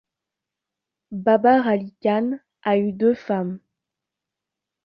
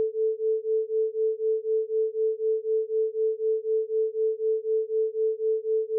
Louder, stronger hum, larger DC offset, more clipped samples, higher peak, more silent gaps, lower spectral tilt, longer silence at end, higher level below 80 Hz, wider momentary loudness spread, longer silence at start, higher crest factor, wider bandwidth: first, -21 LUFS vs -27 LUFS; neither; neither; neither; first, -4 dBFS vs -20 dBFS; neither; first, -9 dB/octave vs 1 dB/octave; first, 1.3 s vs 0 s; first, -68 dBFS vs under -90 dBFS; first, 13 LU vs 2 LU; first, 1.1 s vs 0 s; first, 18 dB vs 6 dB; first, 5.8 kHz vs 0.5 kHz